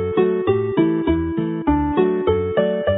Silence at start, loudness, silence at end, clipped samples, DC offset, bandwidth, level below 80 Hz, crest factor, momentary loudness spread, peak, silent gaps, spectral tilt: 0 s; -19 LUFS; 0 s; under 0.1%; under 0.1%; 4 kHz; -34 dBFS; 14 dB; 2 LU; -4 dBFS; none; -12.5 dB/octave